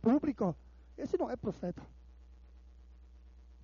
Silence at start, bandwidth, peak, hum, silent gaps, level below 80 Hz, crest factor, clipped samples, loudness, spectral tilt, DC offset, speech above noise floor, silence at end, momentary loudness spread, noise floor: 0.05 s; 7 kHz; -18 dBFS; none; none; -56 dBFS; 20 dB; under 0.1%; -36 LUFS; -8.5 dB/octave; under 0.1%; 22 dB; 0.1 s; 27 LU; -56 dBFS